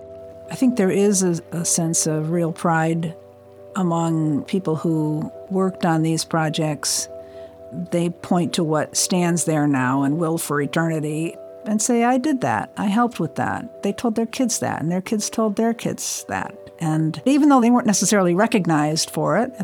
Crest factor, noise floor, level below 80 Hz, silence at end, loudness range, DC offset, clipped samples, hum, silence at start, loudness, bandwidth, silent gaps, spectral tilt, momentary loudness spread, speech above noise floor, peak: 16 dB; -43 dBFS; -66 dBFS; 0 s; 4 LU; under 0.1%; under 0.1%; none; 0 s; -20 LUFS; 20 kHz; none; -4.5 dB/octave; 10 LU; 23 dB; -4 dBFS